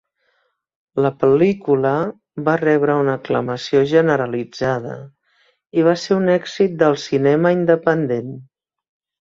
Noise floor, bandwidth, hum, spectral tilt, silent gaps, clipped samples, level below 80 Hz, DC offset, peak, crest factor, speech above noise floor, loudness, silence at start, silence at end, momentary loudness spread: -67 dBFS; 7.6 kHz; none; -7 dB/octave; none; under 0.1%; -58 dBFS; under 0.1%; -2 dBFS; 16 dB; 50 dB; -18 LUFS; 0.95 s; 0.75 s; 10 LU